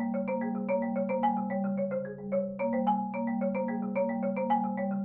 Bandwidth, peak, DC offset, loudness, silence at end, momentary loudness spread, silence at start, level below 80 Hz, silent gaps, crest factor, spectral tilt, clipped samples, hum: 3.3 kHz; -16 dBFS; under 0.1%; -31 LUFS; 0 s; 4 LU; 0 s; -72 dBFS; none; 14 dB; -8 dB/octave; under 0.1%; none